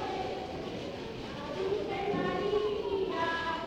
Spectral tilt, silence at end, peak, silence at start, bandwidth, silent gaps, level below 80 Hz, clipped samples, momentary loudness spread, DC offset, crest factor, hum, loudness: -5.5 dB/octave; 0 s; -18 dBFS; 0 s; 9.6 kHz; none; -56 dBFS; under 0.1%; 9 LU; under 0.1%; 14 dB; none; -34 LUFS